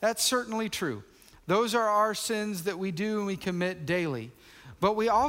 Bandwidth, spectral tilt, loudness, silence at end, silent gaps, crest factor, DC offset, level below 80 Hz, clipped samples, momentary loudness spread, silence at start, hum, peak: 16 kHz; -4 dB/octave; -29 LUFS; 0 s; none; 18 dB; under 0.1%; -62 dBFS; under 0.1%; 9 LU; 0 s; none; -12 dBFS